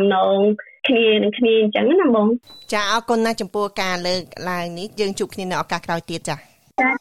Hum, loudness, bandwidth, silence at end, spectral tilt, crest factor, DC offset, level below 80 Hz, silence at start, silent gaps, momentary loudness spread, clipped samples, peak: none; -20 LUFS; 14 kHz; 0.05 s; -4.5 dB/octave; 14 dB; under 0.1%; -56 dBFS; 0 s; none; 11 LU; under 0.1%; -6 dBFS